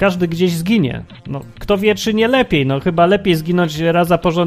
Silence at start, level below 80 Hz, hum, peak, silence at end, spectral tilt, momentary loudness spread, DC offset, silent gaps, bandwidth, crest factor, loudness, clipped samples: 0 s; -40 dBFS; none; 0 dBFS; 0 s; -6 dB/octave; 14 LU; under 0.1%; none; 15.5 kHz; 14 dB; -15 LUFS; under 0.1%